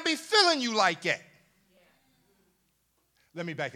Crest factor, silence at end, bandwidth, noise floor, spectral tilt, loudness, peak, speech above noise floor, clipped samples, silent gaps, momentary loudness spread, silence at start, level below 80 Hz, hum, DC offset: 24 dB; 0.05 s; 16.5 kHz; -73 dBFS; -2.5 dB/octave; -26 LUFS; -6 dBFS; 46 dB; under 0.1%; none; 17 LU; 0 s; -82 dBFS; none; under 0.1%